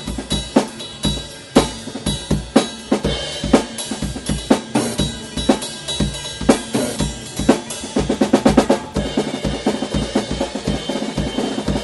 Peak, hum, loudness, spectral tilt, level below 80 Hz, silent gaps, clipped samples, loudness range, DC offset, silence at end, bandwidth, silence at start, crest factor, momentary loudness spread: 0 dBFS; none; -20 LUFS; -4.5 dB/octave; -32 dBFS; none; under 0.1%; 2 LU; under 0.1%; 0 s; 12 kHz; 0 s; 20 dB; 7 LU